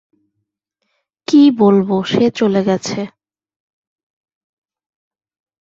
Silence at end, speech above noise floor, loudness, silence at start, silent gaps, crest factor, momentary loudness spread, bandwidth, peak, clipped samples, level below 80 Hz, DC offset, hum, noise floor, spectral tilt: 2.5 s; 62 dB; -14 LUFS; 1.3 s; none; 16 dB; 15 LU; 7.8 kHz; -2 dBFS; under 0.1%; -58 dBFS; under 0.1%; none; -74 dBFS; -6.5 dB/octave